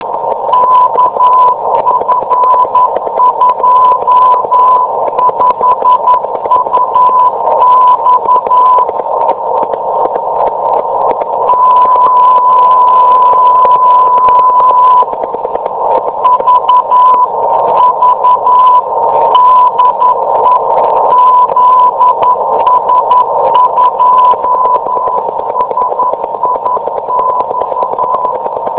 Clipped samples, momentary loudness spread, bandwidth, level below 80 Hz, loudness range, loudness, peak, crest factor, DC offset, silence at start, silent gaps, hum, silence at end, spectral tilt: 1%; 7 LU; 4 kHz; -50 dBFS; 4 LU; -8 LUFS; 0 dBFS; 8 dB; under 0.1%; 0 s; none; none; 0 s; -8 dB/octave